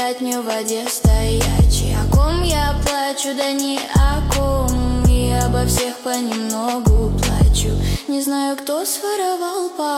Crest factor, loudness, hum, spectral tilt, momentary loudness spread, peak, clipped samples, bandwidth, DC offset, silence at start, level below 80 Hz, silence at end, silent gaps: 14 dB; -18 LUFS; none; -5 dB/octave; 5 LU; -4 dBFS; under 0.1%; 16.5 kHz; under 0.1%; 0 s; -20 dBFS; 0 s; none